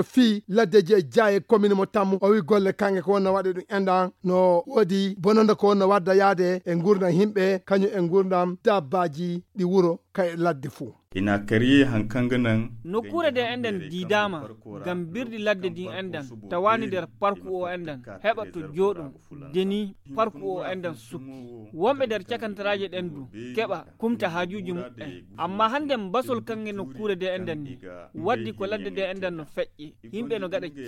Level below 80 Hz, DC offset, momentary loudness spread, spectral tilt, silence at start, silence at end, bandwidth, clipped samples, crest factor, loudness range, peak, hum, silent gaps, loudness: -56 dBFS; under 0.1%; 15 LU; -6.5 dB/octave; 0 s; 0 s; 13.5 kHz; under 0.1%; 18 dB; 8 LU; -6 dBFS; none; none; -24 LUFS